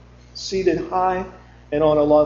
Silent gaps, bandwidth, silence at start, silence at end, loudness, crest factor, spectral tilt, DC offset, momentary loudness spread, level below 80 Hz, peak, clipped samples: none; 7.6 kHz; 0.35 s; 0 s; -20 LUFS; 16 dB; -6 dB/octave; under 0.1%; 16 LU; -44 dBFS; -4 dBFS; under 0.1%